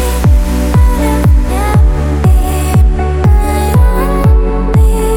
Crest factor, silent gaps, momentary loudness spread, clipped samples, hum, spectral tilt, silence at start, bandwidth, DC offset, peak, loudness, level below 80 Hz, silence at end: 8 dB; none; 2 LU; under 0.1%; none; -7 dB/octave; 0 s; 17 kHz; under 0.1%; 0 dBFS; -11 LUFS; -10 dBFS; 0 s